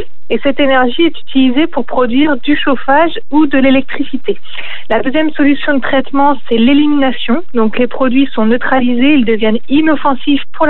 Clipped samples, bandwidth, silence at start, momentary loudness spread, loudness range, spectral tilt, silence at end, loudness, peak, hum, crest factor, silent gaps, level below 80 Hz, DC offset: under 0.1%; 4.2 kHz; 0 s; 6 LU; 1 LU; -8.5 dB/octave; 0 s; -12 LUFS; 0 dBFS; none; 14 dB; none; -44 dBFS; 20%